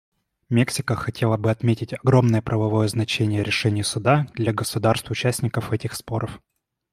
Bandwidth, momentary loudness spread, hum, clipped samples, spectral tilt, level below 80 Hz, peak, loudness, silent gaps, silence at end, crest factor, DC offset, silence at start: 15 kHz; 8 LU; none; under 0.1%; -5.5 dB/octave; -52 dBFS; -4 dBFS; -22 LUFS; none; 0.55 s; 20 dB; under 0.1%; 0.5 s